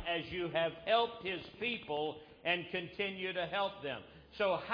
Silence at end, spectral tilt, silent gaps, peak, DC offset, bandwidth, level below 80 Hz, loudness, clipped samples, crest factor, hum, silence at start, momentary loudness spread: 0 s; -6.5 dB/octave; none; -18 dBFS; under 0.1%; 5.2 kHz; -66 dBFS; -37 LUFS; under 0.1%; 18 dB; none; 0 s; 9 LU